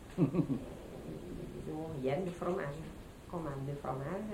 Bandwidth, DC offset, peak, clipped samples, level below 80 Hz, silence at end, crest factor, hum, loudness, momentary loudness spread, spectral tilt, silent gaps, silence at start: 16 kHz; under 0.1%; -18 dBFS; under 0.1%; -56 dBFS; 0 s; 20 dB; none; -39 LUFS; 13 LU; -8 dB/octave; none; 0 s